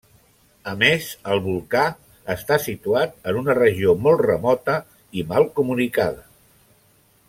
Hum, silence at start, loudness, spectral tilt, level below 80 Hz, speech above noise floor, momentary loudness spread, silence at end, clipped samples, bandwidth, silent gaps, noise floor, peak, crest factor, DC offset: none; 0.65 s; -20 LUFS; -5.5 dB/octave; -54 dBFS; 38 dB; 13 LU; 1.1 s; under 0.1%; 16.5 kHz; none; -58 dBFS; -2 dBFS; 20 dB; under 0.1%